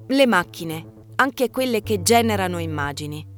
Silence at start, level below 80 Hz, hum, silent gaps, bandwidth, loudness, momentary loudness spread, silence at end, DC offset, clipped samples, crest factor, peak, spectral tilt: 0 s; -52 dBFS; none; none; over 20 kHz; -21 LUFS; 14 LU; 0 s; under 0.1%; under 0.1%; 18 dB; -2 dBFS; -4 dB/octave